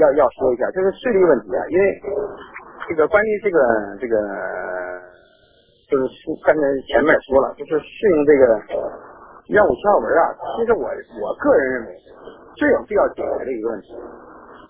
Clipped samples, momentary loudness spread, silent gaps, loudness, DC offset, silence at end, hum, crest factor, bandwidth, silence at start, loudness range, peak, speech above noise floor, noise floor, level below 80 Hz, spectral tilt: under 0.1%; 13 LU; none; -19 LUFS; under 0.1%; 0.1 s; none; 18 dB; 3.8 kHz; 0 s; 4 LU; 0 dBFS; 37 dB; -55 dBFS; -48 dBFS; -9.5 dB/octave